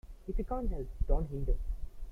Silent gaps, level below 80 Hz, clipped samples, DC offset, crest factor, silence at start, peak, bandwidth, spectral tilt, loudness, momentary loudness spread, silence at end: none; -34 dBFS; under 0.1%; under 0.1%; 18 dB; 0.05 s; -16 dBFS; 2.5 kHz; -10 dB/octave; -38 LUFS; 8 LU; 0 s